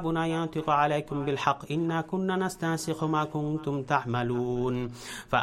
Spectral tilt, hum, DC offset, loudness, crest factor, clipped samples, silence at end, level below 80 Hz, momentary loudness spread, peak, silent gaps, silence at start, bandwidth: -6 dB/octave; none; under 0.1%; -29 LUFS; 20 dB; under 0.1%; 0 s; -54 dBFS; 5 LU; -10 dBFS; none; 0 s; 15.5 kHz